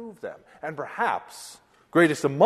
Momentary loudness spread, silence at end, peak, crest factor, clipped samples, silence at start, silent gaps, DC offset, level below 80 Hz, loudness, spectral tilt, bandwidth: 20 LU; 0 s; -6 dBFS; 20 dB; under 0.1%; 0 s; none; under 0.1%; -70 dBFS; -25 LUFS; -5.5 dB/octave; 13 kHz